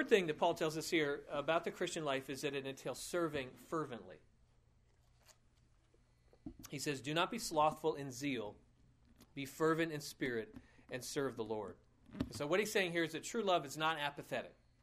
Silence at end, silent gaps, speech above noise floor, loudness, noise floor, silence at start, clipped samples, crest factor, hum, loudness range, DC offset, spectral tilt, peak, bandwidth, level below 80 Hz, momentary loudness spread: 0.3 s; none; 32 dB; -39 LUFS; -71 dBFS; 0 s; under 0.1%; 22 dB; none; 8 LU; under 0.1%; -4 dB/octave; -18 dBFS; 15.5 kHz; -68 dBFS; 14 LU